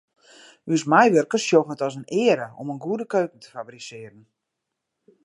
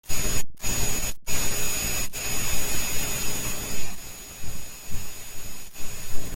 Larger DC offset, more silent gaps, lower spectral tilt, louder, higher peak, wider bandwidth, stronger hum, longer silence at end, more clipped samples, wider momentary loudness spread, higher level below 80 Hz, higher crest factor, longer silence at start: neither; neither; first, -5 dB/octave vs -2 dB/octave; first, -21 LUFS vs -29 LUFS; first, -2 dBFS vs -8 dBFS; second, 11 kHz vs 17 kHz; neither; first, 1.15 s vs 0 s; neither; first, 21 LU vs 12 LU; second, -76 dBFS vs -36 dBFS; first, 22 dB vs 12 dB; first, 0.65 s vs 0.05 s